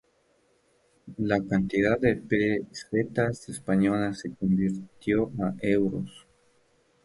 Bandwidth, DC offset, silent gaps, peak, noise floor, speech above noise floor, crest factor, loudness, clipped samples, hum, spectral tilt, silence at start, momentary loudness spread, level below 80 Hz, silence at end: 11.5 kHz; under 0.1%; none; -8 dBFS; -67 dBFS; 41 dB; 20 dB; -27 LUFS; under 0.1%; none; -7 dB/octave; 1.05 s; 9 LU; -54 dBFS; 0.85 s